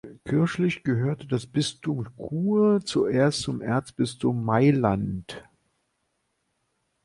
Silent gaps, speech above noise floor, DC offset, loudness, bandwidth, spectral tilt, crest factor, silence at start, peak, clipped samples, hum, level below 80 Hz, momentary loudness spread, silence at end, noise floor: none; 51 dB; under 0.1%; -25 LUFS; 11.5 kHz; -6.5 dB/octave; 20 dB; 0.05 s; -6 dBFS; under 0.1%; none; -56 dBFS; 11 LU; 1.65 s; -75 dBFS